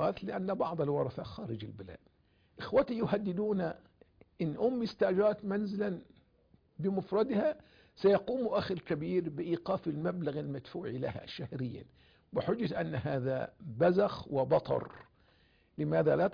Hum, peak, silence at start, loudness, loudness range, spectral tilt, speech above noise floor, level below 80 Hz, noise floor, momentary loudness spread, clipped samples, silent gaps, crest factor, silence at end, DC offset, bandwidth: none; -18 dBFS; 0 s; -34 LUFS; 4 LU; -6.5 dB/octave; 35 dB; -64 dBFS; -68 dBFS; 13 LU; under 0.1%; none; 16 dB; 0 s; under 0.1%; 5.2 kHz